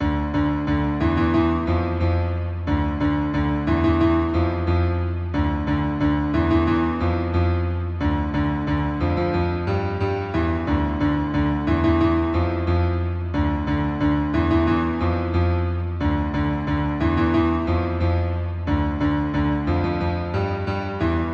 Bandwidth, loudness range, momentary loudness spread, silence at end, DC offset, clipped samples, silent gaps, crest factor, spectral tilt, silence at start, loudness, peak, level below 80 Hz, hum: 6 kHz; 2 LU; 5 LU; 0 s; under 0.1%; under 0.1%; none; 14 dB; -9 dB/octave; 0 s; -22 LUFS; -8 dBFS; -30 dBFS; none